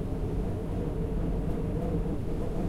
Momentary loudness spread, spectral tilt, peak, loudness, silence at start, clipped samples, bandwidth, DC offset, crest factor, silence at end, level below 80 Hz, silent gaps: 2 LU; -9 dB/octave; -18 dBFS; -33 LUFS; 0 s; under 0.1%; 13 kHz; under 0.1%; 12 dB; 0 s; -34 dBFS; none